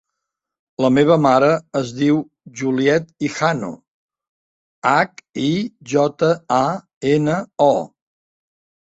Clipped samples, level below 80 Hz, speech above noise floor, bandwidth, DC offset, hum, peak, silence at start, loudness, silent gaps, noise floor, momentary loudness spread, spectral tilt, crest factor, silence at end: under 0.1%; -58 dBFS; 63 dB; 8.2 kHz; under 0.1%; none; -2 dBFS; 0.8 s; -18 LUFS; 3.88-4.09 s, 4.29-4.82 s, 6.96-7.01 s; -81 dBFS; 11 LU; -6 dB/octave; 18 dB; 1.1 s